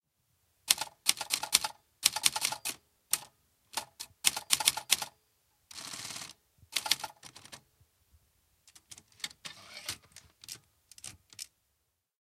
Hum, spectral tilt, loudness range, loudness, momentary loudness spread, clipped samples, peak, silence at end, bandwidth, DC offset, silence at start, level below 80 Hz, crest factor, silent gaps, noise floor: none; 1.5 dB/octave; 16 LU; -31 LUFS; 22 LU; under 0.1%; 0 dBFS; 0.75 s; 16 kHz; under 0.1%; 0.65 s; -72 dBFS; 38 dB; none; -80 dBFS